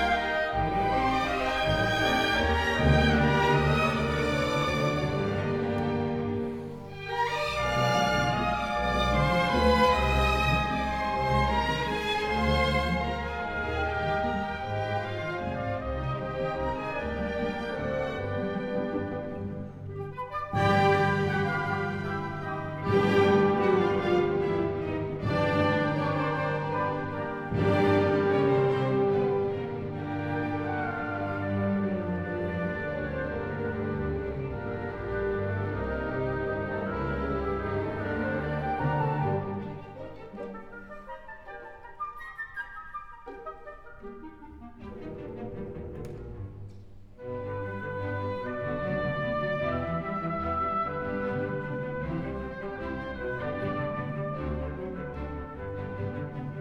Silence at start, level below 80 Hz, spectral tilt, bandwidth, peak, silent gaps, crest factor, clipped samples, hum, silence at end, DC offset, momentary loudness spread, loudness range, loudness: 0 s; -42 dBFS; -6.5 dB/octave; 16 kHz; -10 dBFS; none; 18 dB; under 0.1%; none; 0 s; under 0.1%; 16 LU; 14 LU; -29 LUFS